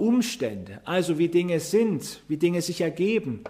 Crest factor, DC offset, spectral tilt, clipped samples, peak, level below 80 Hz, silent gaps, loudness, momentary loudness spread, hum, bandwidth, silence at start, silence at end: 14 dB; under 0.1%; -5.5 dB/octave; under 0.1%; -10 dBFS; -64 dBFS; none; -25 LUFS; 9 LU; none; 15.5 kHz; 0 s; 0 s